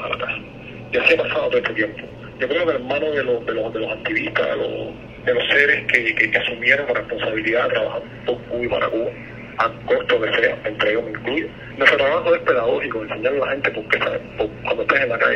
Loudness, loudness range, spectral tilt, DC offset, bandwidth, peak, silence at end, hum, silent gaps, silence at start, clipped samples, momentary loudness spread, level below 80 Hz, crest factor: -20 LUFS; 4 LU; -5.5 dB/octave; under 0.1%; 8.6 kHz; 0 dBFS; 0 s; none; none; 0 s; under 0.1%; 11 LU; -50 dBFS; 20 dB